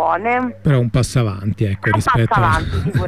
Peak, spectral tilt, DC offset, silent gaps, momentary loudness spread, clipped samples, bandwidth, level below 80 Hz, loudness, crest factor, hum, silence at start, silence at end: -4 dBFS; -6.5 dB/octave; 0.5%; none; 5 LU; under 0.1%; 13.5 kHz; -32 dBFS; -17 LUFS; 12 dB; none; 0 s; 0 s